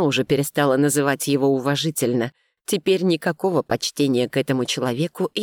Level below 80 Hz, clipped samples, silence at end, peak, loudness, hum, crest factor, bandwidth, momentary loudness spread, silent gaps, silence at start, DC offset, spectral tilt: -62 dBFS; under 0.1%; 0 s; -6 dBFS; -21 LUFS; none; 14 dB; 18.5 kHz; 5 LU; none; 0 s; under 0.1%; -4.5 dB/octave